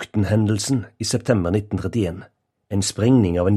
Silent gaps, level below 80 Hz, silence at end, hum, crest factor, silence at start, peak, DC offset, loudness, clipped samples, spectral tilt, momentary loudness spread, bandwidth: none; -44 dBFS; 0 s; none; 18 dB; 0 s; -4 dBFS; under 0.1%; -21 LUFS; under 0.1%; -6 dB/octave; 8 LU; 13.5 kHz